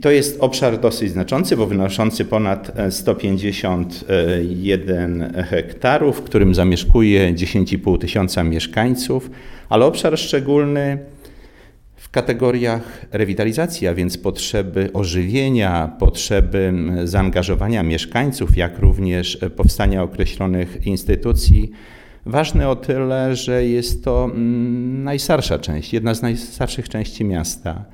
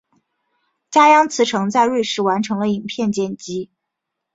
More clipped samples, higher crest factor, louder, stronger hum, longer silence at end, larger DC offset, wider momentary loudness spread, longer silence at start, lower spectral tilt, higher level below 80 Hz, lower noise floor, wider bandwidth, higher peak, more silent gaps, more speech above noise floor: neither; about the same, 18 dB vs 18 dB; about the same, -18 LUFS vs -17 LUFS; neither; second, 0.1 s vs 0.7 s; neither; second, 7 LU vs 16 LU; second, 0 s vs 0.9 s; first, -6 dB/octave vs -4.5 dB/octave; first, -24 dBFS vs -62 dBFS; second, -45 dBFS vs -79 dBFS; first, 17.5 kHz vs 8 kHz; about the same, 0 dBFS vs -2 dBFS; neither; second, 28 dB vs 63 dB